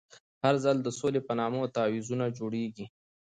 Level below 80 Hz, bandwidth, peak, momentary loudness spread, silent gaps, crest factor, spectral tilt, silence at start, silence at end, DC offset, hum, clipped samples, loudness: -72 dBFS; 9.6 kHz; -14 dBFS; 9 LU; 0.20-0.41 s; 18 dB; -6 dB/octave; 0.15 s; 0.35 s; under 0.1%; none; under 0.1%; -30 LUFS